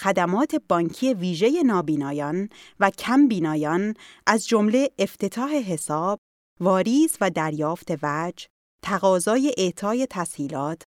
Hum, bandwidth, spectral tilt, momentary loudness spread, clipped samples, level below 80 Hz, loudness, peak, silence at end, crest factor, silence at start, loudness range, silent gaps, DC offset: none; 16.5 kHz; -5 dB/octave; 9 LU; under 0.1%; -66 dBFS; -23 LUFS; -2 dBFS; 0.1 s; 22 dB; 0 s; 2 LU; 6.18-6.57 s, 8.50-8.79 s; under 0.1%